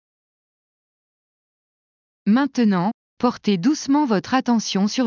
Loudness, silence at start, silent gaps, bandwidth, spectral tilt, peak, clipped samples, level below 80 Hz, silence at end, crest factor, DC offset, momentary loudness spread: -20 LUFS; 2.25 s; 2.94-3.17 s; 7.4 kHz; -5.5 dB/octave; -6 dBFS; under 0.1%; -64 dBFS; 0 s; 16 dB; under 0.1%; 5 LU